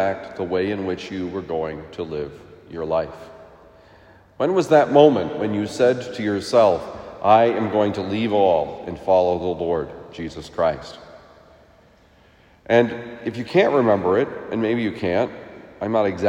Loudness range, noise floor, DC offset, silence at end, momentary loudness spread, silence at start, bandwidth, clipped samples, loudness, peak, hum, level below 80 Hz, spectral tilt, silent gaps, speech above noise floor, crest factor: 9 LU; -53 dBFS; under 0.1%; 0 s; 16 LU; 0 s; 11.5 kHz; under 0.1%; -21 LUFS; 0 dBFS; none; -56 dBFS; -6.5 dB/octave; none; 33 dB; 20 dB